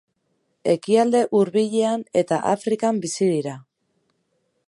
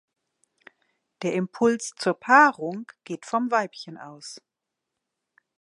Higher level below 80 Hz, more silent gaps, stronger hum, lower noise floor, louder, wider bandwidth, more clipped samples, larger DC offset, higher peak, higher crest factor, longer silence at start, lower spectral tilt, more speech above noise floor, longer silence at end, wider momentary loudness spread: first, -72 dBFS vs -78 dBFS; neither; neither; second, -71 dBFS vs -84 dBFS; about the same, -21 LUFS vs -23 LUFS; about the same, 11.5 kHz vs 11.5 kHz; neither; neither; about the same, -6 dBFS vs -4 dBFS; second, 16 dB vs 22 dB; second, 0.65 s vs 1.2 s; about the same, -5.5 dB/octave vs -4.5 dB/octave; second, 50 dB vs 60 dB; second, 1.05 s vs 1.2 s; second, 8 LU vs 23 LU